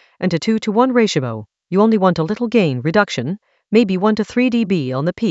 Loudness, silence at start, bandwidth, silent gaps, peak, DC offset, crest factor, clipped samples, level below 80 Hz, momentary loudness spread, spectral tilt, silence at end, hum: -17 LUFS; 0.2 s; 8 kHz; none; 0 dBFS; under 0.1%; 16 dB; under 0.1%; -56 dBFS; 7 LU; -6.5 dB/octave; 0 s; none